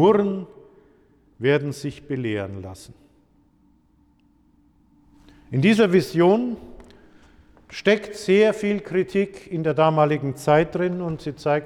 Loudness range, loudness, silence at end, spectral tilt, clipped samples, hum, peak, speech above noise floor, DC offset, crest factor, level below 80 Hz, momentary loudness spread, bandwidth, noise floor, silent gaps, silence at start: 13 LU; -21 LUFS; 0 s; -6.5 dB/octave; under 0.1%; none; -6 dBFS; 39 dB; under 0.1%; 18 dB; -56 dBFS; 15 LU; 14 kHz; -60 dBFS; none; 0 s